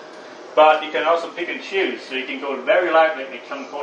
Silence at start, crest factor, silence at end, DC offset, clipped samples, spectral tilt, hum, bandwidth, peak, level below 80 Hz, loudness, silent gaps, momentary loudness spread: 0 s; 18 dB; 0 s; under 0.1%; under 0.1%; -3 dB/octave; none; 8.4 kHz; -2 dBFS; -84 dBFS; -19 LUFS; none; 16 LU